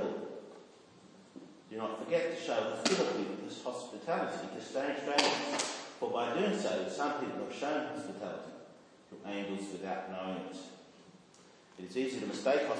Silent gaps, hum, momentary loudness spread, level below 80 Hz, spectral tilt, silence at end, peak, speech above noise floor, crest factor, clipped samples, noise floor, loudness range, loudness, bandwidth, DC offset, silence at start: none; none; 20 LU; -86 dBFS; -3.5 dB/octave; 0 s; -10 dBFS; 25 dB; 26 dB; under 0.1%; -60 dBFS; 9 LU; -36 LUFS; 10.5 kHz; under 0.1%; 0 s